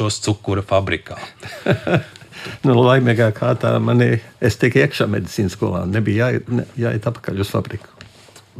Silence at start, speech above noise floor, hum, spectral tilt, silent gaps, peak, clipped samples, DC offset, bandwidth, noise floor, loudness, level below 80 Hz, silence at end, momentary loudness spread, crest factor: 0 s; 28 dB; none; -6.5 dB/octave; none; -2 dBFS; under 0.1%; under 0.1%; 14.5 kHz; -45 dBFS; -18 LUFS; -50 dBFS; 0 s; 13 LU; 16 dB